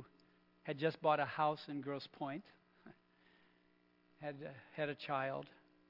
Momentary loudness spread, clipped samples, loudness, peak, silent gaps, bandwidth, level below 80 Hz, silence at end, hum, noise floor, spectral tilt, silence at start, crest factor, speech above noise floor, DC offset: 15 LU; under 0.1%; -41 LUFS; -22 dBFS; none; 5.8 kHz; -88 dBFS; 0.4 s; 60 Hz at -75 dBFS; -73 dBFS; -4 dB/octave; 0 s; 22 dB; 33 dB; under 0.1%